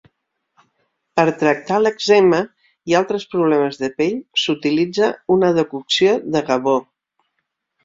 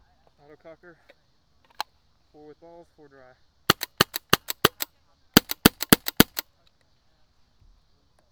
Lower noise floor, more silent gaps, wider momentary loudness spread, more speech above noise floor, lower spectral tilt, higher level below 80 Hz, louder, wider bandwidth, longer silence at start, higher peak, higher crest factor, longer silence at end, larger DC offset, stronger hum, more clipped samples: first, -74 dBFS vs -66 dBFS; neither; second, 7 LU vs 18 LU; first, 57 dB vs 15 dB; first, -5 dB/octave vs -3 dB/octave; second, -60 dBFS vs -50 dBFS; first, -17 LUFS vs -22 LUFS; second, 7.8 kHz vs over 20 kHz; second, 1.15 s vs 3.7 s; about the same, -2 dBFS vs 0 dBFS; second, 16 dB vs 28 dB; second, 1 s vs 1.9 s; neither; neither; neither